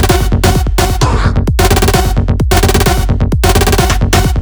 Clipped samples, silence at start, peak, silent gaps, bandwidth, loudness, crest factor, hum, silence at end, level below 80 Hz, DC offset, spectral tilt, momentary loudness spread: 0.5%; 0 s; 0 dBFS; none; over 20 kHz; -11 LUFS; 10 dB; none; 0 s; -14 dBFS; under 0.1%; -5 dB/octave; 3 LU